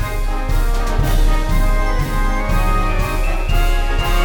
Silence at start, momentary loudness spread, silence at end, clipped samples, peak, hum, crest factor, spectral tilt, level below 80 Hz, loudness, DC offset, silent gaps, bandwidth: 0 s; 3 LU; 0 s; under 0.1%; -4 dBFS; none; 10 dB; -5 dB/octave; -16 dBFS; -20 LUFS; under 0.1%; none; 18 kHz